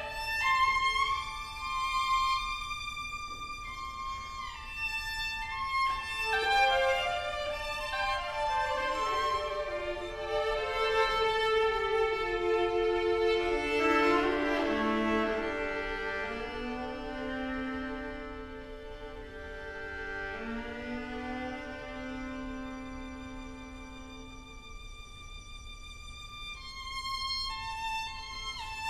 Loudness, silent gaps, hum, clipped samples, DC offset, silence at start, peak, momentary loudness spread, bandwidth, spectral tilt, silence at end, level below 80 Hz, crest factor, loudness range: -32 LUFS; none; none; under 0.1%; under 0.1%; 0 s; -14 dBFS; 17 LU; 14 kHz; -3.5 dB/octave; 0 s; -48 dBFS; 18 dB; 14 LU